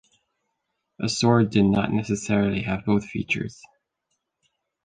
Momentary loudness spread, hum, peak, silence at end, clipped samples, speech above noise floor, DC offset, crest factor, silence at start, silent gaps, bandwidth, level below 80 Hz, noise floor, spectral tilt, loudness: 8 LU; none; -6 dBFS; 1.3 s; under 0.1%; 56 dB; under 0.1%; 18 dB; 1 s; none; 9.6 kHz; -50 dBFS; -78 dBFS; -6 dB/octave; -23 LUFS